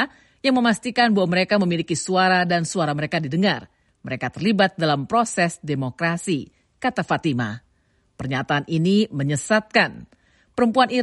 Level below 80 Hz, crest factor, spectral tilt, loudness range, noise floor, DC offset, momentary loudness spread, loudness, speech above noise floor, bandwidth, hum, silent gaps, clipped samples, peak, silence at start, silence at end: -58 dBFS; 18 dB; -5 dB/octave; 4 LU; -64 dBFS; under 0.1%; 9 LU; -21 LUFS; 43 dB; 11.5 kHz; none; none; under 0.1%; -4 dBFS; 0 s; 0 s